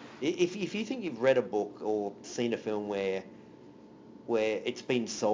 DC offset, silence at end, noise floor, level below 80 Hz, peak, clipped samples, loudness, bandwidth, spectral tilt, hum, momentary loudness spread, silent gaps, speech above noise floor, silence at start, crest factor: under 0.1%; 0 s; -53 dBFS; -74 dBFS; -14 dBFS; under 0.1%; -32 LUFS; 7.6 kHz; -4.5 dB/octave; none; 10 LU; none; 21 dB; 0 s; 18 dB